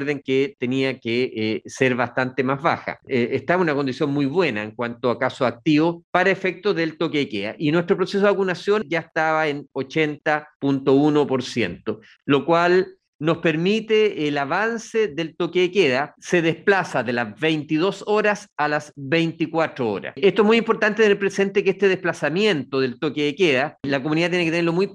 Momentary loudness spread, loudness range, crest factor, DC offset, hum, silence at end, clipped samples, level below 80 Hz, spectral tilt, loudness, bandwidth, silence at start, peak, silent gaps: 7 LU; 2 LU; 18 dB; under 0.1%; none; 0 s; under 0.1%; -66 dBFS; -6 dB/octave; -21 LUFS; 10.5 kHz; 0 s; -2 dBFS; 6.04-6.13 s, 10.55-10.60 s, 13.08-13.19 s, 18.52-18.56 s